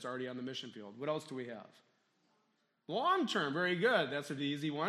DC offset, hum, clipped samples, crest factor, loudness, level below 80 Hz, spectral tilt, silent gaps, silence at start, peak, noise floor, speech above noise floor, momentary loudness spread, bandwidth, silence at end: under 0.1%; none; under 0.1%; 20 dB; -36 LUFS; -88 dBFS; -5 dB/octave; none; 0 s; -16 dBFS; -78 dBFS; 42 dB; 13 LU; 14 kHz; 0 s